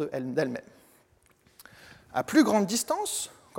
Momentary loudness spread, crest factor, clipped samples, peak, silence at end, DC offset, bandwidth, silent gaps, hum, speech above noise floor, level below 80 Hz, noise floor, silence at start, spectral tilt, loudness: 11 LU; 20 dB; under 0.1%; -8 dBFS; 0 s; under 0.1%; 17 kHz; none; none; 37 dB; -70 dBFS; -64 dBFS; 0 s; -4 dB/octave; -27 LUFS